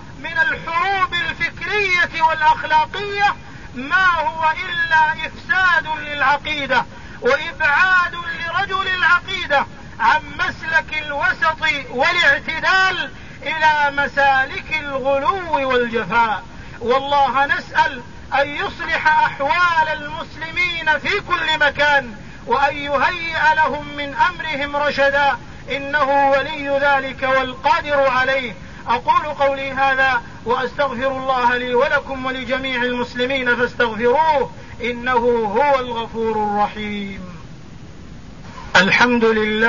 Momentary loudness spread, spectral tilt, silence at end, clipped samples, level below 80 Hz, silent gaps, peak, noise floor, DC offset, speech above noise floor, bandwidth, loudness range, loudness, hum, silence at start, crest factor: 10 LU; -4 dB/octave; 0 s; under 0.1%; -44 dBFS; none; -2 dBFS; -38 dBFS; 1%; 20 dB; 7.4 kHz; 2 LU; -17 LUFS; none; 0 s; 16 dB